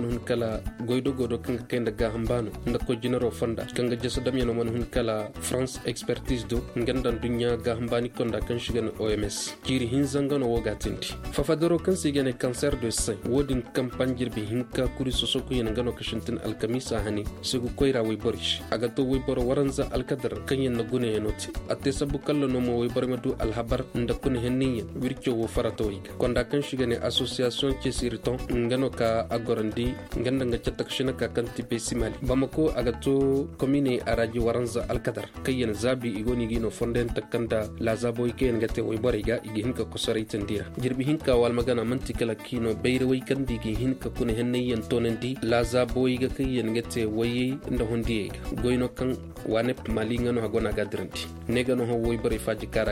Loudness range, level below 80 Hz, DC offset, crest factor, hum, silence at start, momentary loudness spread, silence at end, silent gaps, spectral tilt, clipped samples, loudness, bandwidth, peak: 2 LU; -40 dBFS; under 0.1%; 18 dB; none; 0 s; 5 LU; 0 s; none; -5.5 dB/octave; under 0.1%; -28 LUFS; 16.5 kHz; -10 dBFS